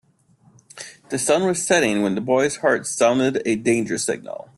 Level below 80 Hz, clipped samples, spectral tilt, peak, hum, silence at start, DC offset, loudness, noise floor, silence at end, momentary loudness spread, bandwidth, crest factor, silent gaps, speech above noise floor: -60 dBFS; under 0.1%; -4 dB/octave; -4 dBFS; none; 0.75 s; under 0.1%; -20 LUFS; -57 dBFS; 0.15 s; 11 LU; 12.5 kHz; 18 dB; none; 37 dB